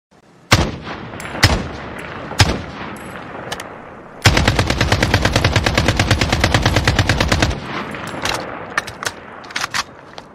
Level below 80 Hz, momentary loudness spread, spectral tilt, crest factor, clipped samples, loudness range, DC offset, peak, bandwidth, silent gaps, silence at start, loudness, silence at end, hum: -28 dBFS; 15 LU; -4 dB/octave; 18 dB; under 0.1%; 5 LU; under 0.1%; 0 dBFS; 16 kHz; none; 0.5 s; -17 LUFS; 0 s; none